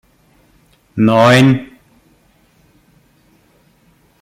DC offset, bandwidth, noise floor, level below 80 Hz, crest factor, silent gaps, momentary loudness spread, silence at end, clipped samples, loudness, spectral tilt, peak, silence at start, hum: under 0.1%; 15.5 kHz; -53 dBFS; -54 dBFS; 18 dB; none; 12 LU; 2.55 s; under 0.1%; -11 LUFS; -6.5 dB/octave; 0 dBFS; 0.95 s; none